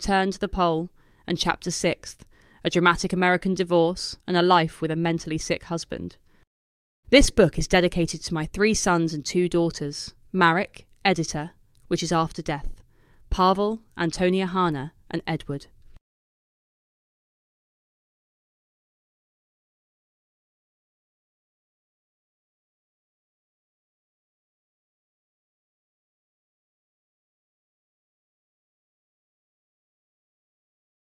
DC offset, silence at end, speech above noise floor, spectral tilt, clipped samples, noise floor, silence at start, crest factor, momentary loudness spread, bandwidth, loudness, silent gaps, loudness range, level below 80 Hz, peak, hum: under 0.1%; 15.5 s; 31 dB; -4.5 dB/octave; under 0.1%; -54 dBFS; 0 s; 26 dB; 13 LU; 14 kHz; -24 LUFS; 6.47-7.03 s; 6 LU; -42 dBFS; -2 dBFS; none